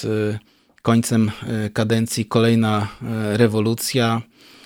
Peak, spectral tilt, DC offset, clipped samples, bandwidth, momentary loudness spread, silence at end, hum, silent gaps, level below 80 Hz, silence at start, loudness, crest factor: -2 dBFS; -5.5 dB/octave; under 0.1%; under 0.1%; 17 kHz; 9 LU; 0.4 s; none; none; -56 dBFS; 0 s; -20 LUFS; 18 dB